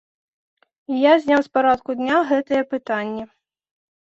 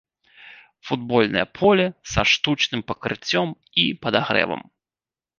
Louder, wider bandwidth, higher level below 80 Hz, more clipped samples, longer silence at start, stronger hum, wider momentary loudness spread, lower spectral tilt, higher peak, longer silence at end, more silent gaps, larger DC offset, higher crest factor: about the same, -19 LUFS vs -21 LUFS; about the same, 7.8 kHz vs 7.4 kHz; second, -62 dBFS vs -48 dBFS; neither; first, 0.9 s vs 0.4 s; neither; about the same, 12 LU vs 10 LU; about the same, -5.5 dB/octave vs -4.5 dB/octave; second, -4 dBFS vs 0 dBFS; about the same, 0.9 s vs 0.8 s; neither; neither; about the same, 18 dB vs 22 dB